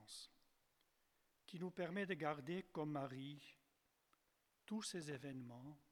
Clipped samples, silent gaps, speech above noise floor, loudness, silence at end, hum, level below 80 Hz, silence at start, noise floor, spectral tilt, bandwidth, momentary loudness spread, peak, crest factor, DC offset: under 0.1%; none; 35 dB; -49 LUFS; 0.15 s; none; -86 dBFS; 0 s; -83 dBFS; -5 dB/octave; 18 kHz; 15 LU; -28 dBFS; 22 dB; under 0.1%